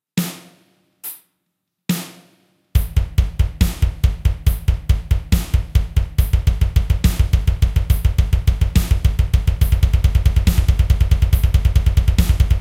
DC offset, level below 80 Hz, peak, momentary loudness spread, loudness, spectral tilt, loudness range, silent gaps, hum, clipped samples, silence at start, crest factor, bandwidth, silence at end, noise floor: under 0.1%; -18 dBFS; 0 dBFS; 8 LU; -18 LUFS; -6 dB/octave; 6 LU; none; none; under 0.1%; 0.15 s; 16 dB; 16.5 kHz; 0 s; -75 dBFS